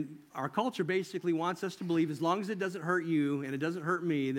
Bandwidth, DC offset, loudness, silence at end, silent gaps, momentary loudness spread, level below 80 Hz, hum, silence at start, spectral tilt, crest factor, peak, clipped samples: 16.5 kHz; under 0.1%; -33 LUFS; 0 s; none; 5 LU; -82 dBFS; none; 0 s; -6.5 dB/octave; 18 dB; -14 dBFS; under 0.1%